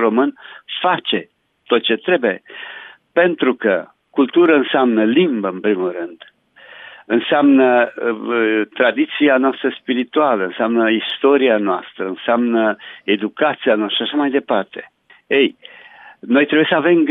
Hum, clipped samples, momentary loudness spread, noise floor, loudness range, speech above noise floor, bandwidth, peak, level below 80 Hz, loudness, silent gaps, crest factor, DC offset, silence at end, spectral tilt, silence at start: none; under 0.1%; 12 LU; -43 dBFS; 3 LU; 27 dB; 4 kHz; -2 dBFS; -74 dBFS; -16 LUFS; none; 14 dB; under 0.1%; 0 s; -8.5 dB/octave; 0 s